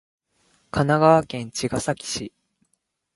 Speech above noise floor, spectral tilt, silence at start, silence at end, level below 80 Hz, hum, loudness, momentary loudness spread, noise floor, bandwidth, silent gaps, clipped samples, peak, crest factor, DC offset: 52 dB; -5 dB/octave; 0.75 s; 0.85 s; -52 dBFS; none; -22 LUFS; 14 LU; -73 dBFS; 11.5 kHz; none; under 0.1%; -2 dBFS; 22 dB; under 0.1%